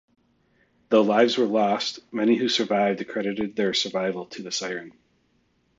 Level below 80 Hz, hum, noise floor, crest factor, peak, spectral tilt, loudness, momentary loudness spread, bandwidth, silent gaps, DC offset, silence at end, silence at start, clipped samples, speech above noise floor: -70 dBFS; none; -67 dBFS; 20 dB; -6 dBFS; -4 dB/octave; -24 LUFS; 9 LU; 7.8 kHz; none; under 0.1%; 0.9 s; 0.9 s; under 0.1%; 44 dB